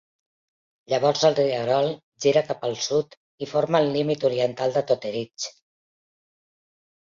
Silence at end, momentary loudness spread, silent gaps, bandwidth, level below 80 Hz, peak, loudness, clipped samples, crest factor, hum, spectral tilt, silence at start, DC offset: 1.7 s; 11 LU; 2.03-2.12 s, 3.17-3.38 s; 7.6 kHz; -68 dBFS; -6 dBFS; -23 LUFS; under 0.1%; 20 dB; none; -4.5 dB/octave; 0.9 s; under 0.1%